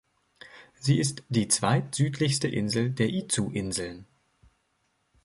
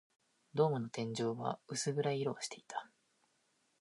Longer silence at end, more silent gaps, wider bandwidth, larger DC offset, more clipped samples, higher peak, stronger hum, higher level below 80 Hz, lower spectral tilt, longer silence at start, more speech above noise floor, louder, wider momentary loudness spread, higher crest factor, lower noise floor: first, 1.2 s vs 0.95 s; neither; about the same, 11.5 kHz vs 11.5 kHz; neither; neither; first, -10 dBFS vs -20 dBFS; neither; first, -58 dBFS vs -84 dBFS; about the same, -4.5 dB/octave vs -5 dB/octave; about the same, 0.45 s vs 0.55 s; first, 46 dB vs 40 dB; first, -27 LUFS vs -38 LUFS; about the same, 11 LU vs 11 LU; about the same, 20 dB vs 20 dB; second, -73 dBFS vs -77 dBFS